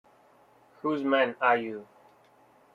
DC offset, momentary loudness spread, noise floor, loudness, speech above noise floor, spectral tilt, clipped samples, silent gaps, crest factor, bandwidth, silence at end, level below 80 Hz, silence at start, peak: under 0.1%; 14 LU; -60 dBFS; -27 LUFS; 34 dB; -6.5 dB/octave; under 0.1%; none; 22 dB; 7.2 kHz; 0.9 s; -80 dBFS; 0.85 s; -10 dBFS